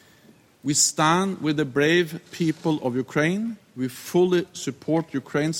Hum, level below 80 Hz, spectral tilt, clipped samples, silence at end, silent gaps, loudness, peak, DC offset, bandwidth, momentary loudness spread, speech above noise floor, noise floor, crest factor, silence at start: none; -64 dBFS; -4 dB/octave; under 0.1%; 0 s; none; -23 LUFS; -6 dBFS; under 0.1%; 17 kHz; 12 LU; 31 dB; -55 dBFS; 18 dB; 0.65 s